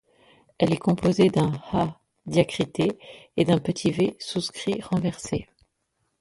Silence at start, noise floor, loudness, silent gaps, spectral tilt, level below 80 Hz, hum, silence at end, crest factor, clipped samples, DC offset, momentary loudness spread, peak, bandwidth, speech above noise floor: 0.6 s; -75 dBFS; -25 LUFS; none; -6.5 dB/octave; -54 dBFS; none; 0.75 s; 20 dB; under 0.1%; under 0.1%; 11 LU; -6 dBFS; 11.5 kHz; 51 dB